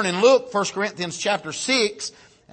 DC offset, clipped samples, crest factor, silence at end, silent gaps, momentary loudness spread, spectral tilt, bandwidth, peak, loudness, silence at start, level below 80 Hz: under 0.1%; under 0.1%; 18 dB; 0.45 s; none; 9 LU; -3 dB/octave; 8.8 kHz; -4 dBFS; -21 LUFS; 0 s; -68 dBFS